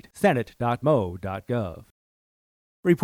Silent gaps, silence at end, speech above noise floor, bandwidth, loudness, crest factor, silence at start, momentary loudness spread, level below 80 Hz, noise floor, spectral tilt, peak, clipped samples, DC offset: 1.91-2.83 s; 0 s; over 65 dB; 15.5 kHz; -26 LUFS; 20 dB; 0.15 s; 9 LU; -56 dBFS; under -90 dBFS; -7.5 dB/octave; -6 dBFS; under 0.1%; under 0.1%